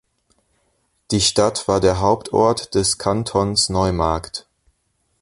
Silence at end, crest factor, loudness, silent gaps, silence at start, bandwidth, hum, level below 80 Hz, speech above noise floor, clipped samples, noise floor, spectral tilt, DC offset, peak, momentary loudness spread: 0.8 s; 18 dB; -18 LUFS; none; 1.1 s; 11.5 kHz; none; -38 dBFS; 50 dB; under 0.1%; -68 dBFS; -4 dB/octave; under 0.1%; -2 dBFS; 6 LU